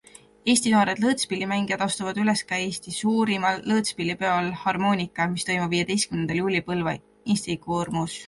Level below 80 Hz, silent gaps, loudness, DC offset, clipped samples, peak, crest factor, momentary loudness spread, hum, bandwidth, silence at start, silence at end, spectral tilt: -58 dBFS; none; -24 LUFS; under 0.1%; under 0.1%; -6 dBFS; 20 dB; 6 LU; none; 11.5 kHz; 0.45 s; 0 s; -4 dB/octave